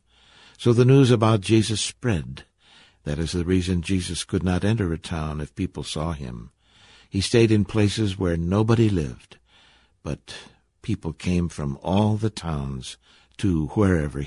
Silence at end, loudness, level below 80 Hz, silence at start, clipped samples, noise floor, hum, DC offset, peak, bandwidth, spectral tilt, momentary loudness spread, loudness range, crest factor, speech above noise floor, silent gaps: 0 s; -23 LUFS; -38 dBFS; 0.6 s; under 0.1%; -57 dBFS; none; under 0.1%; -4 dBFS; 11.5 kHz; -6 dB/octave; 16 LU; 6 LU; 18 dB; 35 dB; none